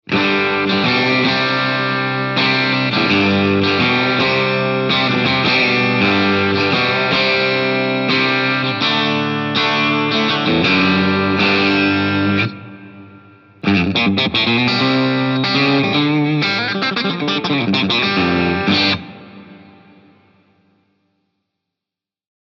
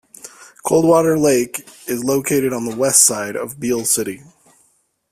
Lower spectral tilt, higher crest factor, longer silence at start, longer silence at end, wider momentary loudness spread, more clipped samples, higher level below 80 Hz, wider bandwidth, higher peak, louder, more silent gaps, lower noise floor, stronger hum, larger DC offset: first, -6 dB/octave vs -3.5 dB/octave; about the same, 14 dB vs 18 dB; second, 0.1 s vs 0.25 s; first, 2.9 s vs 0.95 s; second, 4 LU vs 16 LU; neither; about the same, -56 dBFS vs -56 dBFS; second, 7.2 kHz vs 16 kHz; about the same, -2 dBFS vs 0 dBFS; about the same, -15 LUFS vs -16 LUFS; neither; first, -87 dBFS vs -61 dBFS; neither; neither